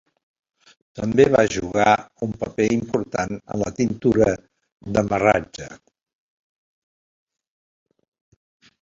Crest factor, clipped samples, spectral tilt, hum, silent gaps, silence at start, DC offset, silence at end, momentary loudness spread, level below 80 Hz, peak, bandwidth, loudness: 20 dB; under 0.1%; -6 dB/octave; none; 4.72-4.77 s; 0.95 s; under 0.1%; 3.05 s; 15 LU; -48 dBFS; -2 dBFS; 7.8 kHz; -21 LUFS